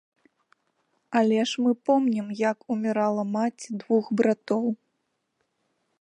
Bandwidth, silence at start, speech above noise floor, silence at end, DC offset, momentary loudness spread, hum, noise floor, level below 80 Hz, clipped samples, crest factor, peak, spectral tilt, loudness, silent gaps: 10 kHz; 1.1 s; 53 dB; 1.25 s; under 0.1%; 6 LU; none; -77 dBFS; -80 dBFS; under 0.1%; 18 dB; -8 dBFS; -5.5 dB/octave; -25 LUFS; none